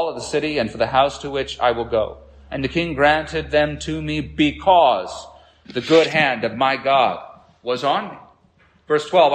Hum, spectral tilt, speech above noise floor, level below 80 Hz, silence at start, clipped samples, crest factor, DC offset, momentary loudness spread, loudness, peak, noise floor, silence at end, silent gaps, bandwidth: none; -5 dB/octave; 37 dB; -44 dBFS; 0 s; under 0.1%; 18 dB; under 0.1%; 13 LU; -19 LUFS; -2 dBFS; -56 dBFS; 0 s; none; 9.6 kHz